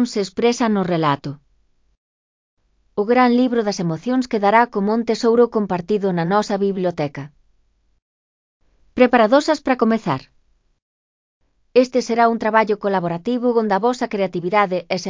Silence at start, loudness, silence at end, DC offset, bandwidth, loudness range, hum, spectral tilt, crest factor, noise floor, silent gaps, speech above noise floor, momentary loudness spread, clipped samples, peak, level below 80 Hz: 0 s; -18 LUFS; 0 s; under 0.1%; 7.6 kHz; 4 LU; none; -6 dB/octave; 18 dB; -61 dBFS; 1.97-2.57 s, 8.02-8.60 s, 10.82-11.40 s; 44 dB; 8 LU; under 0.1%; 0 dBFS; -58 dBFS